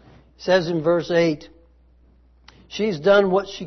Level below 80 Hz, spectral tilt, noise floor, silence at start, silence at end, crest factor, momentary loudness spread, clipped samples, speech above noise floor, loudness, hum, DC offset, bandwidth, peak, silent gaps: -54 dBFS; -6 dB/octave; -54 dBFS; 0.4 s; 0 s; 18 dB; 14 LU; under 0.1%; 35 dB; -20 LUFS; none; under 0.1%; 6.4 kHz; -4 dBFS; none